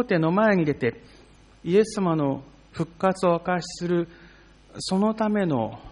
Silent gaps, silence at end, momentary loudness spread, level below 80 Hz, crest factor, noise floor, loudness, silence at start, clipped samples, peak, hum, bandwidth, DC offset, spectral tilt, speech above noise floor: none; 0 s; 14 LU; -54 dBFS; 16 dB; -51 dBFS; -24 LUFS; 0 s; under 0.1%; -8 dBFS; none; 10.5 kHz; under 0.1%; -6.5 dB/octave; 28 dB